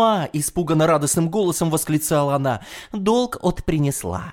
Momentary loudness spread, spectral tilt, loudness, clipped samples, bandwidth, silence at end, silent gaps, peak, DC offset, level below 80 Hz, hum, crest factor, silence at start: 7 LU; -5 dB/octave; -20 LUFS; under 0.1%; 18 kHz; 0 s; none; -6 dBFS; under 0.1%; -42 dBFS; none; 14 dB; 0 s